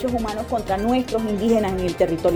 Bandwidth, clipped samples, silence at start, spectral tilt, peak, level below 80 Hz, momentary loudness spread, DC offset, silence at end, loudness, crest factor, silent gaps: 19.5 kHz; under 0.1%; 0 s; -6.5 dB/octave; -6 dBFS; -38 dBFS; 5 LU; under 0.1%; 0 s; -22 LUFS; 16 dB; none